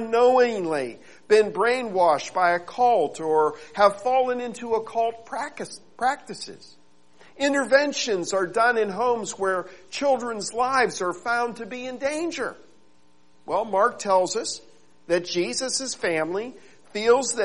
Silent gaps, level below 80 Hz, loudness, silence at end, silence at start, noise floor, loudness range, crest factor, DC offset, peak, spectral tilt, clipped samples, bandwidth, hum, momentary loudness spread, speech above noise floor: none; -66 dBFS; -24 LUFS; 0 s; 0 s; -62 dBFS; 5 LU; 20 dB; 0.3%; -4 dBFS; -3 dB/octave; under 0.1%; 11.5 kHz; none; 12 LU; 38 dB